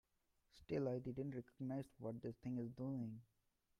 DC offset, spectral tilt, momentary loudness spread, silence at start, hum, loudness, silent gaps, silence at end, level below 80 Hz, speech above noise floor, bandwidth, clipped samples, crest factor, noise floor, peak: under 0.1%; -9 dB/octave; 7 LU; 0.55 s; none; -48 LUFS; none; 0.55 s; -74 dBFS; 37 dB; 12 kHz; under 0.1%; 18 dB; -83 dBFS; -30 dBFS